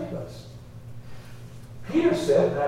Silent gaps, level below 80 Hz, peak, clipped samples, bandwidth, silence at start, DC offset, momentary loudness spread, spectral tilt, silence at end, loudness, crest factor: none; -52 dBFS; -10 dBFS; under 0.1%; 14.5 kHz; 0 s; under 0.1%; 22 LU; -6.5 dB/octave; 0 s; -24 LUFS; 18 dB